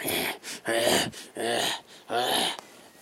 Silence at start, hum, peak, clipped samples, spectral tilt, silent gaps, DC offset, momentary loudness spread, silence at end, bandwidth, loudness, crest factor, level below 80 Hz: 0 s; none; -10 dBFS; under 0.1%; -2 dB/octave; none; under 0.1%; 10 LU; 0.15 s; 16 kHz; -27 LUFS; 20 dB; -66 dBFS